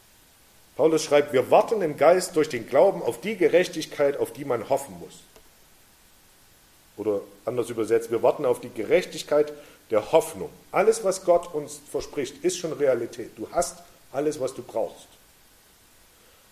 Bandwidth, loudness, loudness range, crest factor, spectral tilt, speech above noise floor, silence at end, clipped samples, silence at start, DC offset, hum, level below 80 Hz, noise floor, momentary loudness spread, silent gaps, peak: 15 kHz; -24 LUFS; 10 LU; 22 dB; -4.5 dB/octave; 32 dB; 1.5 s; under 0.1%; 0.8 s; under 0.1%; none; -60 dBFS; -56 dBFS; 13 LU; none; -4 dBFS